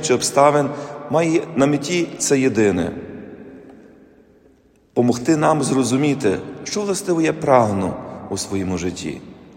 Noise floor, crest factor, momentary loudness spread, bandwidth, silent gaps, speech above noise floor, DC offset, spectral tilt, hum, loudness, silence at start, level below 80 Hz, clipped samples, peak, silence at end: -54 dBFS; 20 dB; 15 LU; 16.5 kHz; none; 36 dB; under 0.1%; -5 dB/octave; none; -19 LUFS; 0 s; -56 dBFS; under 0.1%; 0 dBFS; 0.2 s